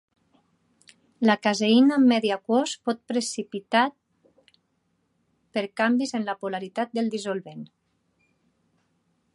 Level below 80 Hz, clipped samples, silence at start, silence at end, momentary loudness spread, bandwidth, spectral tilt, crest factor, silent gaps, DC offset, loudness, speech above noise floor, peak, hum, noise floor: -78 dBFS; under 0.1%; 1.2 s; 1.7 s; 13 LU; 11.5 kHz; -4 dB/octave; 22 dB; none; under 0.1%; -24 LUFS; 49 dB; -6 dBFS; none; -72 dBFS